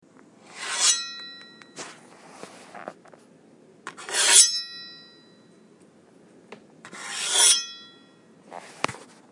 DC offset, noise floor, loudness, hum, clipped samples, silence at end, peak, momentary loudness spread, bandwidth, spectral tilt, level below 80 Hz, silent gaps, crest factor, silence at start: under 0.1%; -55 dBFS; -19 LUFS; none; under 0.1%; 0.35 s; 0 dBFS; 29 LU; 12 kHz; 2 dB/octave; -84 dBFS; none; 28 dB; 0.55 s